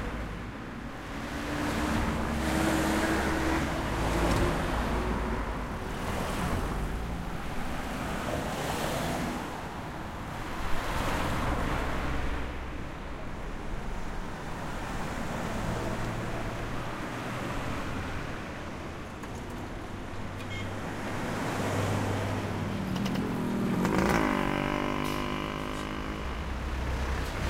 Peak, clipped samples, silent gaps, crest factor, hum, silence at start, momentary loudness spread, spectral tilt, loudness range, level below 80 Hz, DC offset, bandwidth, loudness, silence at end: -8 dBFS; under 0.1%; none; 22 dB; none; 0 s; 11 LU; -5.5 dB/octave; 8 LU; -38 dBFS; under 0.1%; 16 kHz; -32 LUFS; 0 s